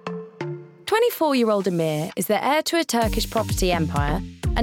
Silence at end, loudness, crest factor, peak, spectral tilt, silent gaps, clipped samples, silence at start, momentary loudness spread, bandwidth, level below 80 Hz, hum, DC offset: 0 s; -22 LUFS; 14 dB; -10 dBFS; -5 dB/octave; none; under 0.1%; 0.05 s; 13 LU; 19.5 kHz; -34 dBFS; none; under 0.1%